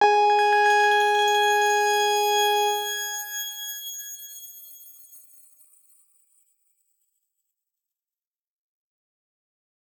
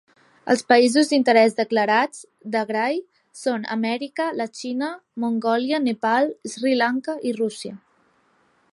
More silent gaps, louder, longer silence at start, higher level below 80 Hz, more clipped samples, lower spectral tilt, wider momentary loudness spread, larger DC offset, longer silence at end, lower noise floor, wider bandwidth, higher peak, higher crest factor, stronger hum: neither; about the same, -21 LUFS vs -22 LUFS; second, 0 s vs 0.45 s; second, under -90 dBFS vs -76 dBFS; neither; second, 2 dB/octave vs -4 dB/octave; first, 20 LU vs 12 LU; neither; first, 4.8 s vs 0.95 s; first, under -90 dBFS vs -62 dBFS; first, over 20 kHz vs 11.5 kHz; second, -8 dBFS vs -2 dBFS; about the same, 18 dB vs 20 dB; neither